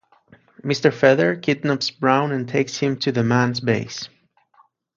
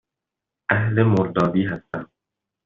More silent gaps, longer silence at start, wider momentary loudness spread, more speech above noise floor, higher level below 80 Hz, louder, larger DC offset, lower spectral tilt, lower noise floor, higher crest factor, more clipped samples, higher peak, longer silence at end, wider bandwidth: neither; about the same, 0.65 s vs 0.7 s; second, 11 LU vs 14 LU; second, 39 dB vs 66 dB; second, -60 dBFS vs -54 dBFS; about the same, -20 LUFS vs -21 LUFS; neither; second, -5.5 dB/octave vs -7 dB/octave; second, -59 dBFS vs -85 dBFS; about the same, 20 dB vs 20 dB; neither; about the same, -2 dBFS vs -4 dBFS; first, 0.9 s vs 0.6 s; about the same, 7.6 kHz vs 7 kHz